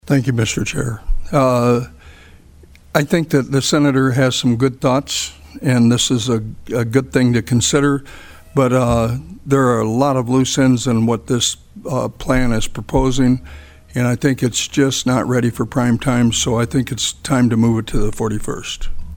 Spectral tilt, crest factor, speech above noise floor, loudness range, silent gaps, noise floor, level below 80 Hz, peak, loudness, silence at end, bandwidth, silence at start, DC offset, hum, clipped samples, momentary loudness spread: -5 dB/octave; 16 dB; 28 dB; 3 LU; none; -44 dBFS; -30 dBFS; 0 dBFS; -17 LUFS; 0 s; 18 kHz; 0.05 s; under 0.1%; none; under 0.1%; 8 LU